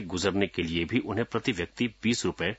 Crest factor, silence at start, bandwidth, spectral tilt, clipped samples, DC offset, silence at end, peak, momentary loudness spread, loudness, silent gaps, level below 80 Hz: 20 dB; 0 s; 8 kHz; -4.5 dB/octave; under 0.1%; under 0.1%; 0 s; -8 dBFS; 3 LU; -29 LUFS; none; -56 dBFS